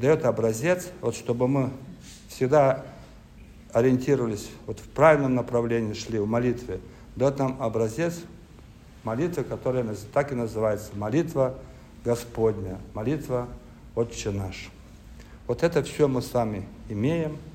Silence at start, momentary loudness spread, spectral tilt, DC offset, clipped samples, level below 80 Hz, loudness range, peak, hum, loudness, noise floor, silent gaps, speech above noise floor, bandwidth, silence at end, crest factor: 0 s; 16 LU; -6.5 dB/octave; under 0.1%; under 0.1%; -48 dBFS; 6 LU; -6 dBFS; none; -26 LUFS; -48 dBFS; none; 23 dB; 16 kHz; 0 s; 22 dB